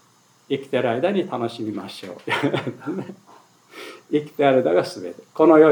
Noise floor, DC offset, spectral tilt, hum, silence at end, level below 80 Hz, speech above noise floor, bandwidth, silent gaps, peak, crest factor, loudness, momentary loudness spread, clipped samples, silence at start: -57 dBFS; under 0.1%; -6.5 dB/octave; none; 0 s; -82 dBFS; 36 dB; 19 kHz; none; -2 dBFS; 20 dB; -22 LUFS; 17 LU; under 0.1%; 0.5 s